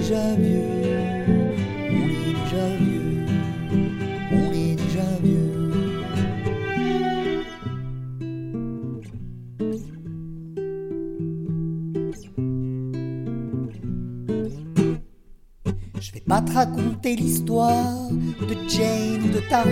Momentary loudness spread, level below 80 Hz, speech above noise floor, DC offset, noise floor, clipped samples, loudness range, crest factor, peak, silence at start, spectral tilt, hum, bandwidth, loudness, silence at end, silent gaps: 11 LU; -42 dBFS; 26 dB; under 0.1%; -47 dBFS; under 0.1%; 8 LU; 18 dB; -6 dBFS; 0 s; -6.5 dB/octave; none; 16.5 kHz; -24 LUFS; 0 s; none